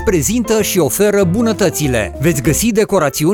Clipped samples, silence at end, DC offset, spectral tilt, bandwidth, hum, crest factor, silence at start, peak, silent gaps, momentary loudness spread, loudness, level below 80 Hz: under 0.1%; 0 s; under 0.1%; -5 dB/octave; 19.5 kHz; none; 12 dB; 0 s; -2 dBFS; none; 3 LU; -14 LUFS; -32 dBFS